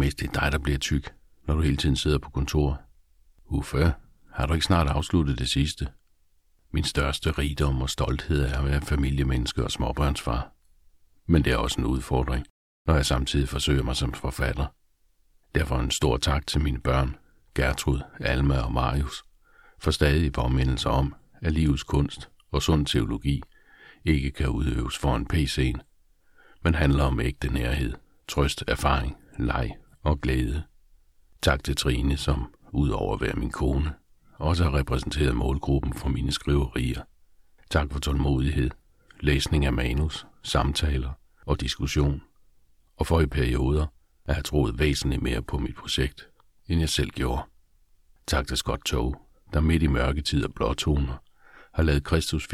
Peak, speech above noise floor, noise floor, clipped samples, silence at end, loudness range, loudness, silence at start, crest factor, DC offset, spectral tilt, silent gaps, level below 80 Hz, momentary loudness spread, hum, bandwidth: -6 dBFS; 39 dB; -63 dBFS; under 0.1%; 0 s; 2 LU; -26 LUFS; 0 s; 20 dB; under 0.1%; -5.5 dB/octave; 12.50-12.85 s; -32 dBFS; 9 LU; none; 15 kHz